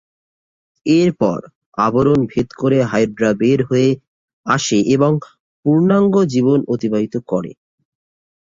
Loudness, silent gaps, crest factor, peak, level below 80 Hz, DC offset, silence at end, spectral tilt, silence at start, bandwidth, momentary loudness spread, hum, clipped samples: -16 LUFS; 1.55-1.72 s, 4.07-4.44 s, 5.40-5.63 s; 14 dB; -2 dBFS; -50 dBFS; under 0.1%; 0.95 s; -6.5 dB/octave; 0.85 s; 7.8 kHz; 9 LU; none; under 0.1%